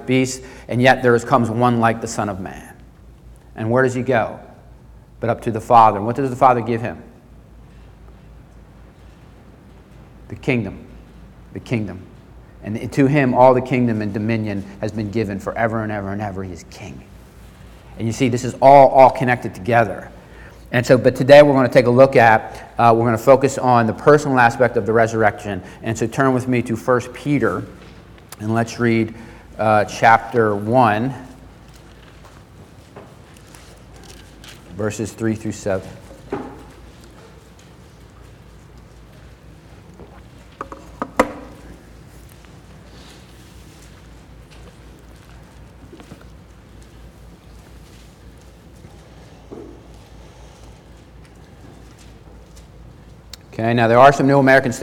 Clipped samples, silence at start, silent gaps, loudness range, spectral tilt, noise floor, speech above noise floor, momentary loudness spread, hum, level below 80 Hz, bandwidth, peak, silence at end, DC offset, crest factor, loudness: under 0.1%; 0 s; none; 16 LU; -6.5 dB/octave; -44 dBFS; 28 dB; 23 LU; none; -46 dBFS; 16.5 kHz; 0 dBFS; 0 s; under 0.1%; 20 dB; -16 LUFS